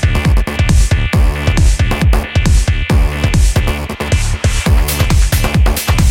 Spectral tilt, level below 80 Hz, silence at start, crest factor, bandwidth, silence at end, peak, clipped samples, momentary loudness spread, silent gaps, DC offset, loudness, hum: -5 dB/octave; -14 dBFS; 0 s; 10 dB; 17 kHz; 0 s; 0 dBFS; under 0.1%; 3 LU; none; under 0.1%; -13 LUFS; none